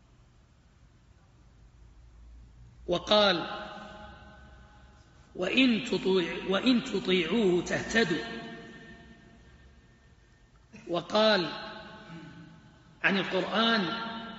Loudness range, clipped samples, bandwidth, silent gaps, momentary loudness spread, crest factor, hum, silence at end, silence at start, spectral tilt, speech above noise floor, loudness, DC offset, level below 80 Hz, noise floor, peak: 6 LU; under 0.1%; 8 kHz; none; 22 LU; 22 dB; none; 0 s; 2.2 s; -2.5 dB/octave; 33 dB; -28 LUFS; under 0.1%; -58 dBFS; -60 dBFS; -10 dBFS